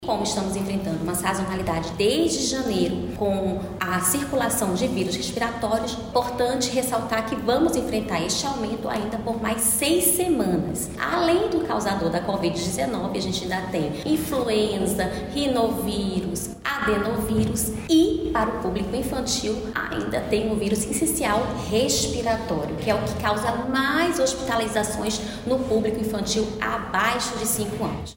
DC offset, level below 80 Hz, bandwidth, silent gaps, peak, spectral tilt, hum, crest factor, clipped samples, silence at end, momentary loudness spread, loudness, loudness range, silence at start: under 0.1%; -42 dBFS; 16.5 kHz; none; -8 dBFS; -4 dB/octave; none; 16 dB; under 0.1%; 0.05 s; 6 LU; -24 LUFS; 2 LU; 0 s